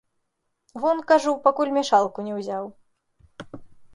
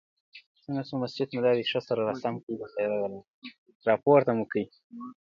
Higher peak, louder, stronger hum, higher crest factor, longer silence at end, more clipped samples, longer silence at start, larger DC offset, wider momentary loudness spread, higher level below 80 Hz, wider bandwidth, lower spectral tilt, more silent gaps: first, -4 dBFS vs -8 dBFS; first, -22 LUFS vs -28 LUFS; neither; about the same, 20 dB vs 20 dB; about the same, 0.1 s vs 0.1 s; neither; first, 0.75 s vs 0.35 s; neither; about the same, 23 LU vs 22 LU; first, -66 dBFS vs -72 dBFS; first, 11.5 kHz vs 7.2 kHz; second, -4.5 dB/octave vs -7.5 dB/octave; second, none vs 0.46-0.55 s, 2.43-2.47 s, 3.30-3.42 s, 3.58-3.66 s, 3.75-3.80 s, 4.84-4.90 s